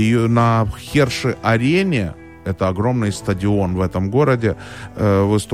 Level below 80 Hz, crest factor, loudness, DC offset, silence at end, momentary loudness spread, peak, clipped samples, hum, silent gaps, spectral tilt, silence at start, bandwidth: -40 dBFS; 16 dB; -18 LUFS; 0.2%; 0 s; 7 LU; -2 dBFS; under 0.1%; none; none; -6.5 dB/octave; 0 s; 15 kHz